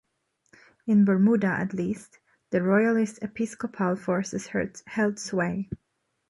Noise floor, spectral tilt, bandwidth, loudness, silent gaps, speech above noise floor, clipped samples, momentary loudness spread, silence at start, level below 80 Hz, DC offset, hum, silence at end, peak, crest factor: -74 dBFS; -7 dB/octave; 11.5 kHz; -26 LUFS; none; 49 dB; under 0.1%; 11 LU; 0.85 s; -60 dBFS; under 0.1%; none; 0.55 s; -10 dBFS; 18 dB